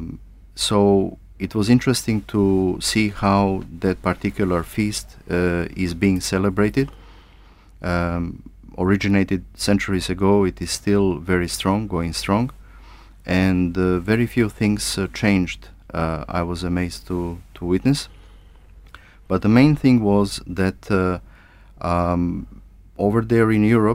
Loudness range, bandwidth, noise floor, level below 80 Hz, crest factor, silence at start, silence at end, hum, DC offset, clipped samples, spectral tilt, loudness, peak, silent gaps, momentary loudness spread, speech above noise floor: 4 LU; 16 kHz; -47 dBFS; -40 dBFS; 18 dB; 0 s; 0 s; none; under 0.1%; under 0.1%; -6 dB/octave; -20 LUFS; -2 dBFS; none; 12 LU; 28 dB